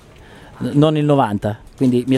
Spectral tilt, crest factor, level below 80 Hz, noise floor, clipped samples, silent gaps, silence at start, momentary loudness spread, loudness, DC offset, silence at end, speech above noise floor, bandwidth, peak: -8 dB/octave; 16 dB; -46 dBFS; -41 dBFS; under 0.1%; none; 0.3 s; 10 LU; -17 LUFS; under 0.1%; 0 s; 26 dB; 12.5 kHz; -2 dBFS